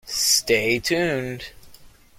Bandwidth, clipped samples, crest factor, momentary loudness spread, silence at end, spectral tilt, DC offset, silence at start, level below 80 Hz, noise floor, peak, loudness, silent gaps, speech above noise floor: 16.5 kHz; under 0.1%; 18 dB; 17 LU; 0.3 s; -2 dB/octave; under 0.1%; 0.05 s; -52 dBFS; -48 dBFS; -6 dBFS; -20 LUFS; none; 26 dB